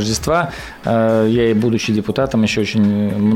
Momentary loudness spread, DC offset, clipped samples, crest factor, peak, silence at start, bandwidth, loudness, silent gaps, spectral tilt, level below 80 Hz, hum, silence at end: 4 LU; under 0.1%; under 0.1%; 10 dB; -6 dBFS; 0 s; 15 kHz; -16 LUFS; none; -6 dB/octave; -40 dBFS; none; 0 s